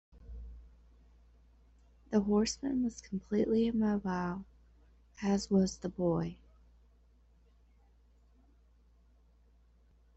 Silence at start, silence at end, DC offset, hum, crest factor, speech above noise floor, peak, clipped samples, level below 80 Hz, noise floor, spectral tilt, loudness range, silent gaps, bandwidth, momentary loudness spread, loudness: 0.15 s; 3.8 s; under 0.1%; none; 20 dB; 33 dB; -16 dBFS; under 0.1%; -56 dBFS; -65 dBFS; -6 dB/octave; 6 LU; none; 8.2 kHz; 21 LU; -33 LUFS